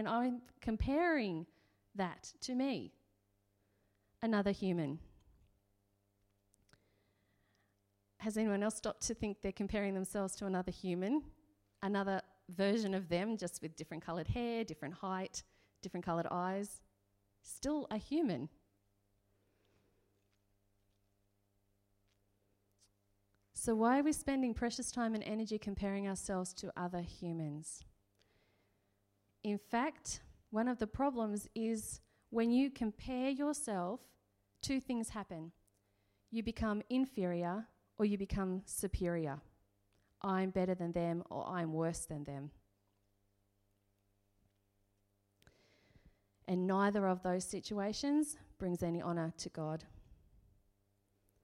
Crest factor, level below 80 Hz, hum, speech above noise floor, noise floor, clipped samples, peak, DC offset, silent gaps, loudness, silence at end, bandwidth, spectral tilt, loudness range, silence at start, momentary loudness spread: 20 dB; -60 dBFS; none; 41 dB; -79 dBFS; under 0.1%; -20 dBFS; under 0.1%; none; -39 LUFS; 1.3 s; 16 kHz; -5.5 dB/octave; 7 LU; 0 s; 12 LU